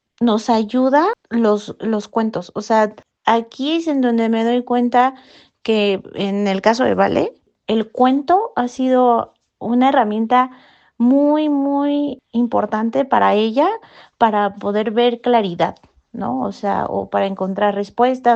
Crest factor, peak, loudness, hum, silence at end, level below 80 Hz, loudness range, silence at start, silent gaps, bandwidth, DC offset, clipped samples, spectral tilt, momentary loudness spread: 16 dB; 0 dBFS; -17 LUFS; none; 0 s; -60 dBFS; 2 LU; 0.2 s; none; 8 kHz; under 0.1%; under 0.1%; -6 dB/octave; 8 LU